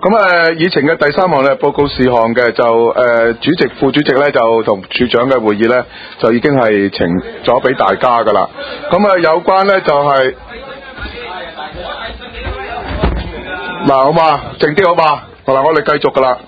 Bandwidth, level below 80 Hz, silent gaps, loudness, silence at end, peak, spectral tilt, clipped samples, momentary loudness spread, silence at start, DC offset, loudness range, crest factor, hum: 8 kHz; -32 dBFS; none; -11 LUFS; 0.05 s; 0 dBFS; -7.5 dB/octave; 0.2%; 14 LU; 0 s; under 0.1%; 6 LU; 12 dB; none